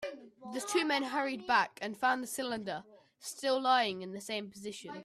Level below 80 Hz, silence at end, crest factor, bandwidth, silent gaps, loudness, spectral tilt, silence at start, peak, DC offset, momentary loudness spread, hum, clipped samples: -78 dBFS; 0 s; 20 dB; 15.5 kHz; none; -33 LUFS; -2.5 dB/octave; 0 s; -16 dBFS; under 0.1%; 15 LU; none; under 0.1%